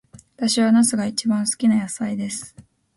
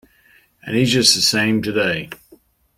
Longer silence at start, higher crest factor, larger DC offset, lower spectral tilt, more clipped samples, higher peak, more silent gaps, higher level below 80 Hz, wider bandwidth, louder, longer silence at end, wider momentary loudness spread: second, 0.4 s vs 0.65 s; second, 14 dB vs 20 dB; neither; about the same, -4 dB/octave vs -3 dB/octave; neither; second, -8 dBFS vs 0 dBFS; neither; second, -62 dBFS vs -54 dBFS; second, 12 kHz vs 16.5 kHz; second, -20 LUFS vs -16 LUFS; second, 0.35 s vs 0.65 s; second, 12 LU vs 16 LU